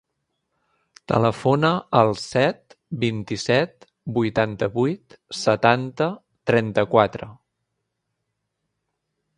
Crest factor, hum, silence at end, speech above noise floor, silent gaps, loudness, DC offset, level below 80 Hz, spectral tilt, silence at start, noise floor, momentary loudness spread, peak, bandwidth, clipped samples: 22 dB; none; 2.05 s; 57 dB; none; -22 LUFS; under 0.1%; -56 dBFS; -6 dB/octave; 1.1 s; -78 dBFS; 14 LU; 0 dBFS; 11 kHz; under 0.1%